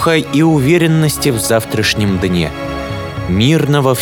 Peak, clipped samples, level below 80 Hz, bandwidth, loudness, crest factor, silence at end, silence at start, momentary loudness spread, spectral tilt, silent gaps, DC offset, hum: 0 dBFS; under 0.1%; -34 dBFS; 19.5 kHz; -13 LUFS; 12 dB; 0 s; 0 s; 10 LU; -5.5 dB/octave; none; under 0.1%; none